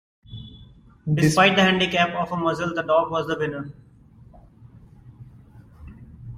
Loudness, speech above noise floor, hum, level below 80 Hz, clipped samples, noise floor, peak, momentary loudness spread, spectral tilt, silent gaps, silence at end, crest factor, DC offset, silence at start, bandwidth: -21 LUFS; 29 dB; none; -52 dBFS; under 0.1%; -50 dBFS; -4 dBFS; 25 LU; -5 dB/octave; none; 0 s; 20 dB; under 0.1%; 0.3 s; 16 kHz